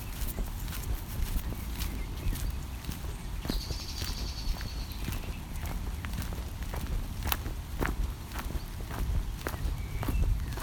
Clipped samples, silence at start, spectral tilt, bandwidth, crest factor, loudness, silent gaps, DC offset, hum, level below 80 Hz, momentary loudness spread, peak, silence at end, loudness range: under 0.1%; 0 s; -4.5 dB/octave; 19 kHz; 30 dB; -36 LUFS; none; under 0.1%; none; -36 dBFS; 6 LU; -4 dBFS; 0 s; 2 LU